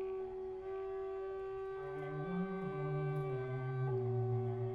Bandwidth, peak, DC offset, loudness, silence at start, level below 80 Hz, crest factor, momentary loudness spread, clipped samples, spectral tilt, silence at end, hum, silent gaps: 4.9 kHz; -28 dBFS; under 0.1%; -40 LUFS; 0 s; -64 dBFS; 12 dB; 7 LU; under 0.1%; -10 dB/octave; 0 s; none; none